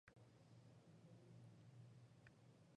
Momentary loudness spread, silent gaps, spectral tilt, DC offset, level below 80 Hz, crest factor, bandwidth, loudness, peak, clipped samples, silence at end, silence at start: 3 LU; none; -6.5 dB/octave; under 0.1%; -88 dBFS; 18 dB; 10 kHz; -67 LUFS; -50 dBFS; under 0.1%; 0 s; 0.05 s